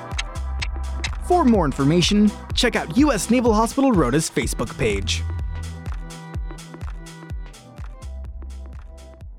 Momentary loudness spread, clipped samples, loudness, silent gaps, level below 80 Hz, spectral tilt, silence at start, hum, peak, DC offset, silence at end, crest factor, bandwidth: 19 LU; under 0.1%; -20 LUFS; none; -32 dBFS; -5 dB/octave; 0 s; none; -6 dBFS; under 0.1%; 0 s; 16 dB; 16 kHz